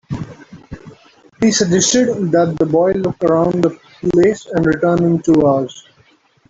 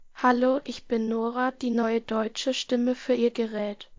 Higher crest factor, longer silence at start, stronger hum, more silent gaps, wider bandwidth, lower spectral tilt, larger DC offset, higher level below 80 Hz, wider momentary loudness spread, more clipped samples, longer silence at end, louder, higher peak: about the same, 14 dB vs 16 dB; about the same, 0.1 s vs 0 s; neither; neither; about the same, 8 kHz vs 7.6 kHz; about the same, -5 dB/octave vs -4.5 dB/octave; neither; first, -46 dBFS vs -64 dBFS; first, 15 LU vs 6 LU; neither; first, 0.7 s vs 0.05 s; first, -15 LUFS vs -26 LUFS; first, -2 dBFS vs -10 dBFS